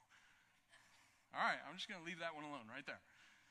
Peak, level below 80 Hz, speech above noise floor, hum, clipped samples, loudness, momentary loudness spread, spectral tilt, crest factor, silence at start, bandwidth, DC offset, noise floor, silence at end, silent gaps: -26 dBFS; -90 dBFS; 22 dB; none; under 0.1%; -46 LUFS; 24 LU; -3.5 dB/octave; 24 dB; 0.1 s; 13 kHz; under 0.1%; -74 dBFS; 0.15 s; none